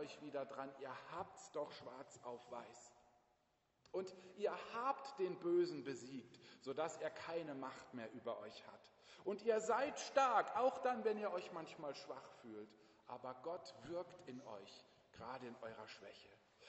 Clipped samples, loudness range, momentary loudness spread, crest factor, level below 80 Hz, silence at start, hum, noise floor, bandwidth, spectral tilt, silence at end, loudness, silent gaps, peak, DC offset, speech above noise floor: under 0.1%; 12 LU; 18 LU; 24 dB; -86 dBFS; 0 s; none; -82 dBFS; 8 kHz; -3.5 dB/octave; 0 s; -45 LUFS; none; -22 dBFS; under 0.1%; 37 dB